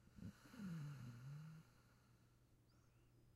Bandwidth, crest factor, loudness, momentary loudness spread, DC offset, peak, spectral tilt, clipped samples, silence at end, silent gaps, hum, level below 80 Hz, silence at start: 15.5 kHz; 14 dB; -57 LUFS; 8 LU; under 0.1%; -44 dBFS; -7 dB/octave; under 0.1%; 0 s; none; none; -78 dBFS; 0 s